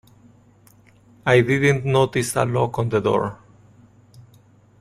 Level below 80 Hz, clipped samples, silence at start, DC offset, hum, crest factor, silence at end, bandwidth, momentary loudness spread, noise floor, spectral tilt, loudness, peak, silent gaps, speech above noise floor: -52 dBFS; under 0.1%; 1.25 s; under 0.1%; none; 20 dB; 0.6 s; 15.5 kHz; 6 LU; -53 dBFS; -6 dB/octave; -20 LUFS; -2 dBFS; none; 34 dB